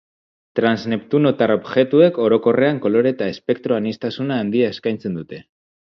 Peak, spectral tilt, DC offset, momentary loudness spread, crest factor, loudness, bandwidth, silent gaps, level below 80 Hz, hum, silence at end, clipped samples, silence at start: -2 dBFS; -8 dB/octave; under 0.1%; 12 LU; 18 dB; -18 LUFS; 6.4 kHz; none; -60 dBFS; none; 0.5 s; under 0.1%; 0.55 s